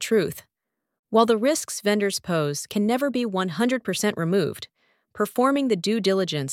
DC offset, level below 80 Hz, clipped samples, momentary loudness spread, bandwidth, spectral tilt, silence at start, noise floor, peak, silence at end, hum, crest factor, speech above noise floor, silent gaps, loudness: under 0.1%; -66 dBFS; under 0.1%; 7 LU; 17 kHz; -4.5 dB/octave; 0 s; -82 dBFS; -4 dBFS; 0 s; none; 20 dB; 59 dB; 0.99-1.03 s; -23 LUFS